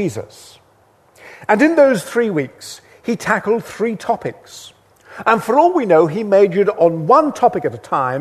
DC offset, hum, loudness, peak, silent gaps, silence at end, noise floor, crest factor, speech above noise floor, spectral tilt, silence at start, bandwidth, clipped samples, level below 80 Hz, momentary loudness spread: under 0.1%; none; -15 LUFS; 0 dBFS; none; 0 s; -53 dBFS; 16 dB; 38 dB; -6 dB/octave; 0 s; 13.5 kHz; under 0.1%; -60 dBFS; 18 LU